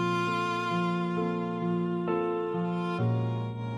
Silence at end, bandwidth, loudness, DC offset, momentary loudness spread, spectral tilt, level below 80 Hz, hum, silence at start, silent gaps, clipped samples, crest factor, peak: 0 s; 9.6 kHz; -30 LUFS; under 0.1%; 2 LU; -7.5 dB/octave; -66 dBFS; none; 0 s; none; under 0.1%; 12 dB; -16 dBFS